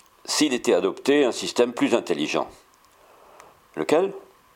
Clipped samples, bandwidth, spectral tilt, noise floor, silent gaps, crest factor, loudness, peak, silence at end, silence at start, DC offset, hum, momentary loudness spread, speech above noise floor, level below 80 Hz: under 0.1%; 16.5 kHz; -3.5 dB/octave; -55 dBFS; none; 20 dB; -23 LUFS; -4 dBFS; 0.35 s; 0.25 s; under 0.1%; none; 10 LU; 33 dB; -68 dBFS